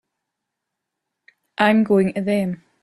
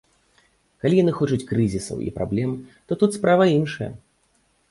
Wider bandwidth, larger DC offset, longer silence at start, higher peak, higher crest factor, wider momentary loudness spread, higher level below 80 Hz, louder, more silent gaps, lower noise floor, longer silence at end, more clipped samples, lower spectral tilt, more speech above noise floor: about the same, 12 kHz vs 11.5 kHz; neither; first, 1.6 s vs 0.85 s; first, -2 dBFS vs -6 dBFS; about the same, 20 dB vs 18 dB; about the same, 11 LU vs 13 LU; second, -62 dBFS vs -50 dBFS; first, -19 LUFS vs -22 LUFS; neither; first, -81 dBFS vs -64 dBFS; second, 0.3 s vs 0.75 s; neither; about the same, -7 dB/octave vs -7 dB/octave; first, 63 dB vs 44 dB